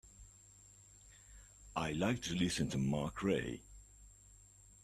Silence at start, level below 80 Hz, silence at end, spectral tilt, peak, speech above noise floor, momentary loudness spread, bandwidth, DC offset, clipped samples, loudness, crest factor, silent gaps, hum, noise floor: 0.05 s; -60 dBFS; 0.7 s; -5 dB/octave; -20 dBFS; 25 dB; 24 LU; 14 kHz; under 0.1%; under 0.1%; -38 LUFS; 20 dB; none; 50 Hz at -55 dBFS; -62 dBFS